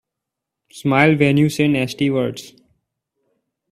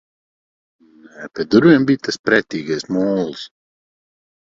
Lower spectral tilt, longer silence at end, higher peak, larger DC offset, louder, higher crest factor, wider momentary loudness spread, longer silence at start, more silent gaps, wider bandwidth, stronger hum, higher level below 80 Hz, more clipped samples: about the same, -6.5 dB/octave vs -6 dB/octave; first, 1.2 s vs 1.05 s; about the same, 0 dBFS vs 0 dBFS; neither; about the same, -17 LUFS vs -17 LUFS; about the same, 20 dB vs 18 dB; second, 12 LU vs 21 LU; second, 0.75 s vs 1.2 s; second, none vs 2.19-2.24 s; first, 14.5 kHz vs 7.8 kHz; neither; about the same, -56 dBFS vs -58 dBFS; neither